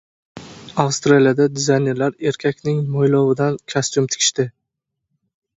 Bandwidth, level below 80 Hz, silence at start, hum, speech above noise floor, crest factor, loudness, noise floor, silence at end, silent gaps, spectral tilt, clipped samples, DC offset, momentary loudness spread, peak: 8 kHz; -58 dBFS; 0.35 s; none; 62 dB; 18 dB; -18 LUFS; -79 dBFS; 1.1 s; none; -4.5 dB/octave; under 0.1%; under 0.1%; 10 LU; 0 dBFS